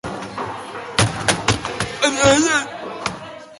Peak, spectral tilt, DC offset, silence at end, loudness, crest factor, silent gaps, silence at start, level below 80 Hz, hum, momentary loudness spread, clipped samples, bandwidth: 0 dBFS; -3.5 dB/octave; under 0.1%; 0 s; -19 LUFS; 20 dB; none; 0.05 s; -42 dBFS; none; 15 LU; under 0.1%; 11.5 kHz